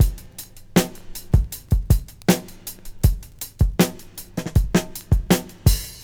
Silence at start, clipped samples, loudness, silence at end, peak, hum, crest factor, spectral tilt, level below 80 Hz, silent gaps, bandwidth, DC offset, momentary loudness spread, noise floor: 0 s; under 0.1%; -22 LUFS; 0 s; 0 dBFS; none; 20 dB; -5.5 dB/octave; -26 dBFS; none; over 20 kHz; under 0.1%; 16 LU; -40 dBFS